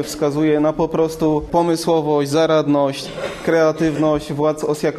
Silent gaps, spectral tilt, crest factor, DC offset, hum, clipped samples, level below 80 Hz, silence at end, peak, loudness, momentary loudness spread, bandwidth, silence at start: none; -6 dB/octave; 14 dB; under 0.1%; none; under 0.1%; -44 dBFS; 0 s; -4 dBFS; -18 LUFS; 5 LU; 13.5 kHz; 0 s